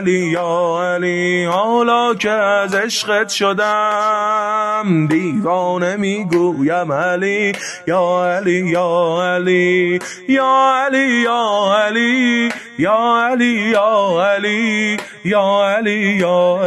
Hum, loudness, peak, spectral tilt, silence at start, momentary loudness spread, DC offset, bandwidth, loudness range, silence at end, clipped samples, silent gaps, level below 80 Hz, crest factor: none; -15 LUFS; -2 dBFS; -5 dB/octave; 0 s; 4 LU; under 0.1%; 12.5 kHz; 2 LU; 0 s; under 0.1%; none; -62 dBFS; 12 dB